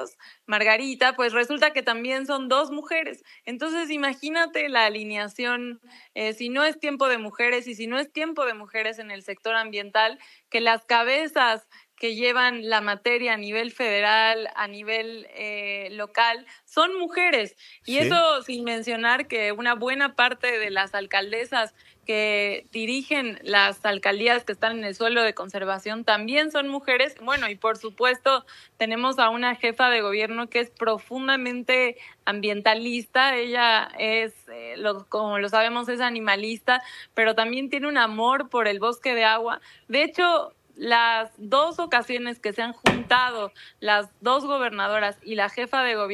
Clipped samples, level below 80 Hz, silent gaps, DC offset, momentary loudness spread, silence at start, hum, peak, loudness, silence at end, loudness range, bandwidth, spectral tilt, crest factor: under 0.1%; -66 dBFS; none; under 0.1%; 9 LU; 0 s; none; -2 dBFS; -23 LUFS; 0 s; 3 LU; 14 kHz; -3 dB/octave; 22 dB